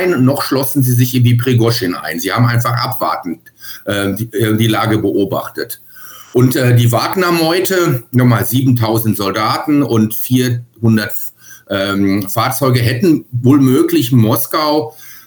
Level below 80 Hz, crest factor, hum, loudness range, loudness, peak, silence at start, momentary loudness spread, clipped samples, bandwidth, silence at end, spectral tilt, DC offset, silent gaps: -54 dBFS; 12 dB; none; 3 LU; -13 LUFS; 0 dBFS; 0 s; 8 LU; under 0.1%; over 20 kHz; 0.05 s; -6 dB/octave; under 0.1%; none